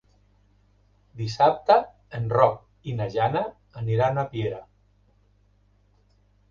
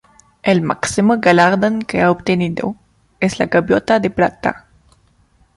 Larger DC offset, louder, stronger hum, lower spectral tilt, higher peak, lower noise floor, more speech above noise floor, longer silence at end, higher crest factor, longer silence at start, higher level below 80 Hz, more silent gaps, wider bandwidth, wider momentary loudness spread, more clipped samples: neither; second, -24 LUFS vs -16 LUFS; first, 50 Hz at -50 dBFS vs none; first, -7 dB/octave vs -5.5 dB/octave; second, -4 dBFS vs 0 dBFS; first, -62 dBFS vs -55 dBFS; about the same, 39 dB vs 40 dB; first, 1.9 s vs 1 s; first, 24 dB vs 16 dB; first, 1.15 s vs 0.45 s; second, -56 dBFS vs -48 dBFS; neither; second, 7.2 kHz vs 11.5 kHz; first, 14 LU vs 10 LU; neither